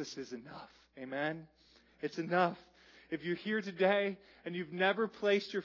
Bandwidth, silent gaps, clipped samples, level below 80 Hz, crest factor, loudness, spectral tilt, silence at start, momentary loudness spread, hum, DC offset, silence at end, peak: 6 kHz; none; under 0.1%; -78 dBFS; 20 dB; -35 LUFS; -3.5 dB/octave; 0 s; 17 LU; none; under 0.1%; 0 s; -16 dBFS